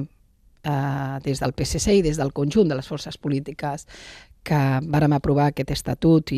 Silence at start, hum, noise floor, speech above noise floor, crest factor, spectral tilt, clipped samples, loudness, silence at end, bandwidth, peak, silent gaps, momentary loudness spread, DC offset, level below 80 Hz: 0 s; none; -57 dBFS; 35 dB; 16 dB; -6.5 dB/octave; under 0.1%; -23 LUFS; 0 s; 14.5 kHz; -6 dBFS; none; 15 LU; under 0.1%; -40 dBFS